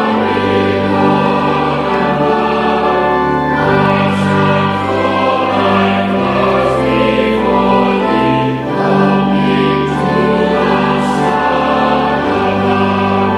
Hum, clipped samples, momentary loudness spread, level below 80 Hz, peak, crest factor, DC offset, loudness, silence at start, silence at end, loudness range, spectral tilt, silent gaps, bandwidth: none; under 0.1%; 2 LU; -38 dBFS; 0 dBFS; 12 dB; under 0.1%; -12 LUFS; 0 s; 0 s; 1 LU; -7 dB/octave; none; 11 kHz